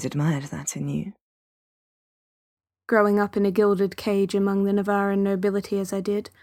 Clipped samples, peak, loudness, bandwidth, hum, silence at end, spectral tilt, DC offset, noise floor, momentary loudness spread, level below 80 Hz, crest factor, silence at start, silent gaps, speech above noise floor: under 0.1%; -4 dBFS; -24 LUFS; 16 kHz; none; 0.2 s; -6.5 dB/octave; under 0.1%; under -90 dBFS; 8 LU; -60 dBFS; 20 dB; 0 s; 1.21-2.57 s; over 67 dB